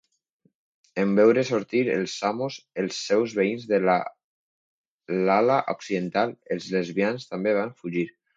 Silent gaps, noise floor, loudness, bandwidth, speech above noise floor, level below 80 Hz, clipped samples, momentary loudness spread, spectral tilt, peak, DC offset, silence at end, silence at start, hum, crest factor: 4.24-4.99 s; -69 dBFS; -25 LUFS; 7.8 kHz; 45 dB; -72 dBFS; under 0.1%; 11 LU; -5.5 dB/octave; -6 dBFS; under 0.1%; 0.25 s; 0.95 s; none; 18 dB